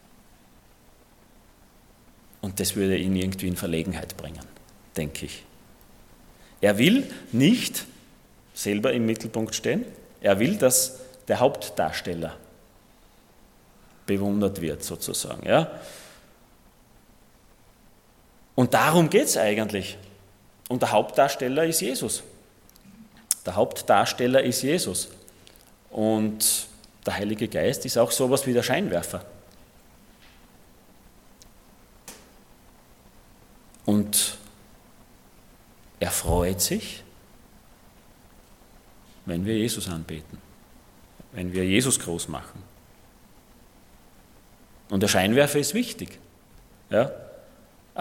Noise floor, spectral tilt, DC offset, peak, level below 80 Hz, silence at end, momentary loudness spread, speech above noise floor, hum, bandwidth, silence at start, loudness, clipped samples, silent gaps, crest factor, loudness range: -56 dBFS; -4 dB/octave; under 0.1%; 0 dBFS; -52 dBFS; 0 s; 19 LU; 32 dB; none; 17.5 kHz; 2.45 s; -24 LUFS; under 0.1%; none; 28 dB; 8 LU